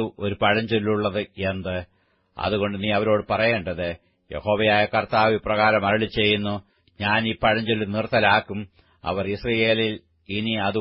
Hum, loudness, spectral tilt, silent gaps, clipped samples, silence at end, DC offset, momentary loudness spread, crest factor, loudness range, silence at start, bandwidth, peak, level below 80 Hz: none; -22 LUFS; -10 dB/octave; none; under 0.1%; 0 s; under 0.1%; 12 LU; 20 dB; 3 LU; 0 s; 5.8 kHz; -4 dBFS; -50 dBFS